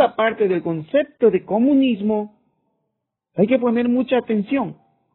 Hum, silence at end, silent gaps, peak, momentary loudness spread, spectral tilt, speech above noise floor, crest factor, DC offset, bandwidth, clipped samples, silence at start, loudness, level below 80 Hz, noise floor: none; 0.4 s; none; -2 dBFS; 7 LU; -5.5 dB/octave; 59 dB; 18 dB; under 0.1%; 4.2 kHz; under 0.1%; 0 s; -19 LUFS; -62 dBFS; -78 dBFS